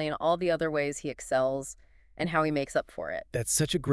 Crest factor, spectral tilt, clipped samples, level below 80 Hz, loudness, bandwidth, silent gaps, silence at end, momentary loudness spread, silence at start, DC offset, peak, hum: 18 dB; -4 dB/octave; under 0.1%; -54 dBFS; -29 LUFS; 12 kHz; none; 0 s; 10 LU; 0 s; under 0.1%; -12 dBFS; none